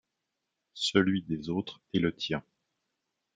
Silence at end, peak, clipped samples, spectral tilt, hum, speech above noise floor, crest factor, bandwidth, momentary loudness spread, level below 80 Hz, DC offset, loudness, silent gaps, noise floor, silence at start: 0.95 s; -8 dBFS; under 0.1%; -5.5 dB/octave; none; 55 dB; 26 dB; 9.4 kHz; 9 LU; -64 dBFS; under 0.1%; -31 LUFS; none; -85 dBFS; 0.75 s